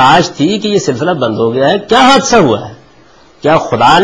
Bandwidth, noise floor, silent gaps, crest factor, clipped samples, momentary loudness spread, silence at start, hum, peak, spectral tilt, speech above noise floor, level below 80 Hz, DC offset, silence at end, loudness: 11 kHz; -42 dBFS; none; 10 dB; 0.2%; 7 LU; 0 s; none; 0 dBFS; -4.5 dB/octave; 34 dB; -40 dBFS; under 0.1%; 0 s; -10 LUFS